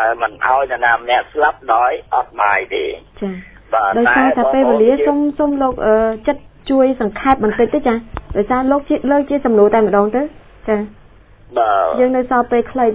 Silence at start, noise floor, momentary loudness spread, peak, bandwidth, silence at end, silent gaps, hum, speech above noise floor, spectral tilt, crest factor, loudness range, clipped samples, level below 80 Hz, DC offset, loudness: 0 s; -43 dBFS; 10 LU; 0 dBFS; 4 kHz; 0 s; none; none; 29 dB; -9.5 dB/octave; 14 dB; 2 LU; under 0.1%; -40 dBFS; under 0.1%; -15 LUFS